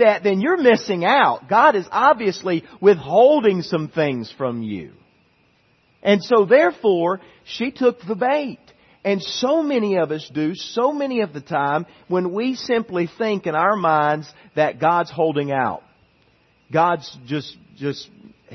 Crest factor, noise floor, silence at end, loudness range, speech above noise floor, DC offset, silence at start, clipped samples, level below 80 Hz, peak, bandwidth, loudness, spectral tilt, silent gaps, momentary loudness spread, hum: 18 dB; -60 dBFS; 0 s; 6 LU; 41 dB; under 0.1%; 0 s; under 0.1%; -66 dBFS; -2 dBFS; 6.4 kHz; -19 LUFS; -6 dB/octave; none; 13 LU; none